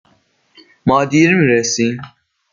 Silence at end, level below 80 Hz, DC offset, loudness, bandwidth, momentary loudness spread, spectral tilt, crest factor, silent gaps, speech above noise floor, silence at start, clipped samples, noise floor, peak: 0.45 s; -52 dBFS; under 0.1%; -14 LUFS; 7.4 kHz; 10 LU; -5 dB/octave; 14 dB; none; 44 dB; 0.85 s; under 0.1%; -57 dBFS; -2 dBFS